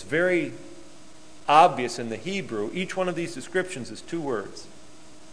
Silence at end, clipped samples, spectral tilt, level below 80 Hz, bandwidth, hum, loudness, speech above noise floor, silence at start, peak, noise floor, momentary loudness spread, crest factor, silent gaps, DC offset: 0.6 s; under 0.1%; -4.5 dB/octave; -62 dBFS; 11 kHz; none; -25 LUFS; 25 dB; 0 s; -2 dBFS; -50 dBFS; 18 LU; 24 dB; none; 0.8%